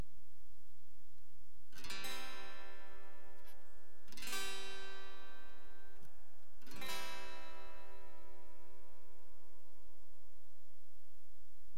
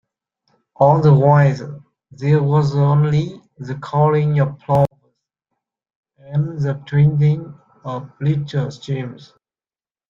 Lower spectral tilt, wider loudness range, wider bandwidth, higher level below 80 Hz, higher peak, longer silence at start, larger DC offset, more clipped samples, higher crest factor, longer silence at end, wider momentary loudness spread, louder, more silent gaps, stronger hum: second, -2.5 dB/octave vs -9 dB/octave; first, 17 LU vs 5 LU; first, 16.5 kHz vs 7 kHz; second, -68 dBFS vs -52 dBFS; second, -24 dBFS vs -2 dBFS; second, 0 s vs 0.8 s; first, 3% vs under 0.1%; neither; first, 26 dB vs 16 dB; second, 0 s vs 0.95 s; first, 24 LU vs 17 LU; second, -49 LUFS vs -17 LUFS; second, none vs 5.95-6.03 s; neither